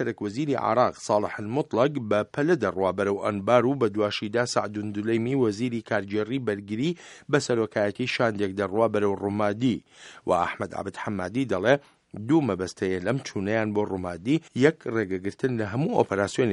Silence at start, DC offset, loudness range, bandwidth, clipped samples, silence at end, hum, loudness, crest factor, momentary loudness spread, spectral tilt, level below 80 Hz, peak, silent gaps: 0 s; under 0.1%; 2 LU; 11.5 kHz; under 0.1%; 0 s; none; -26 LUFS; 22 dB; 7 LU; -6 dB/octave; -64 dBFS; -4 dBFS; none